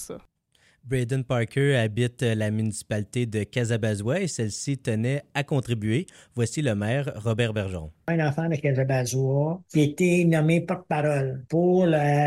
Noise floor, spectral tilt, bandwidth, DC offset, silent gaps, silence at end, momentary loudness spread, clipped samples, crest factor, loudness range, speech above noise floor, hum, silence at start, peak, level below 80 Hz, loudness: -64 dBFS; -6.5 dB/octave; 13 kHz; under 0.1%; none; 0 s; 8 LU; under 0.1%; 16 dB; 4 LU; 39 dB; none; 0 s; -10 dBFS; -56 dBFS; -25 LUFS